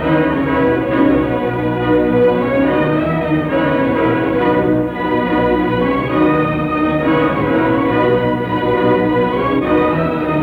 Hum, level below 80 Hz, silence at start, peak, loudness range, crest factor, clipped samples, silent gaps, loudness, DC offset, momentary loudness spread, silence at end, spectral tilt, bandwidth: none; -36 dBFS; 0 s; -2 dBFS; 1 LU; 12 dB; under 0.1%; none; -15 LUFS; under 0.1%; 3 LU; 0 s; -9 dB/octave; 4.8 kHz